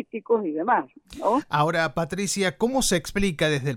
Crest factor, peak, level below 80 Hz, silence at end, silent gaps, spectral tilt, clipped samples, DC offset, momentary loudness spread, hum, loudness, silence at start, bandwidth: 16 dB; -8 dBFS; -44 dBFS; 0 s; none; -4 dB/octave; under 0.1%; under 0.1%; 4 LU; none; -24 LUFS; 0 s; 17.5 kHz